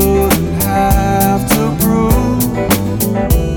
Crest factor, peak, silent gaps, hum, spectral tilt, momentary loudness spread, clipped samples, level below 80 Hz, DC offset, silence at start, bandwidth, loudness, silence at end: 12 dB; 0 dBFS; none; none; -5.5 dB/octave; 3 LU; under 0.1%; -20 dBFS; under 0.1%; 0 s; over 20 kHz; -13 LUFS; 0 s